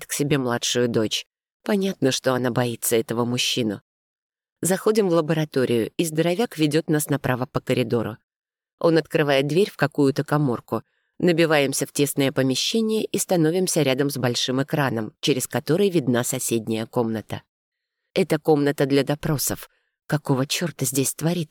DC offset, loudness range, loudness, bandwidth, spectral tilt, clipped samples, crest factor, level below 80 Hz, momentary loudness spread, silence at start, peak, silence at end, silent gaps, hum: under 0.1%; 2 LU; -22 LUFS; 19.5 kHz; -4.5 dB/octave; under 0.1%; 18 dB; -58 dBFS; 6 LU; 0 s; -6 dBFS; 0.05 s; 1.54-1.60 s, 3.81-4.30 s, 4.52-4.56 s, 8.24-8.28 s, 8.36-8.40 s, 8.73-8.78 s, 17.49-17.72 s; none